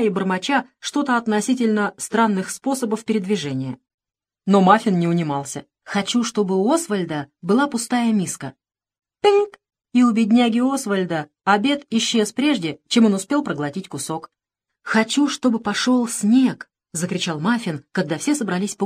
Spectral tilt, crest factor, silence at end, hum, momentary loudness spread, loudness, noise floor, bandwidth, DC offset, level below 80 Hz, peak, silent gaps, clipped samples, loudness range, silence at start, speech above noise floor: -4.5 dB/octave; 20 dB; 0 s; none; 11 LU; -20 LUFS; -83 dBFS; 14.5 kHz; under 0.1%; -68 dBFS; 0 dBFS; 3.94-3.98 s; under 0.1%; 2 LU; 0 s; 63 dB